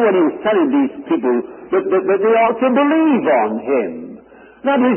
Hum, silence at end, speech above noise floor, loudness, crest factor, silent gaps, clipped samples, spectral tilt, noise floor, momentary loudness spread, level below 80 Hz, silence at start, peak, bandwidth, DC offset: none; 0 s; 26 dB; -16 LUFS; 14 dB; none; under 0.1%; -11 dB/octave; -41 dBFS; 8 LU; -62 dBFS; 0 s; -2 dBFS; 3.3 kHz; under 0.1%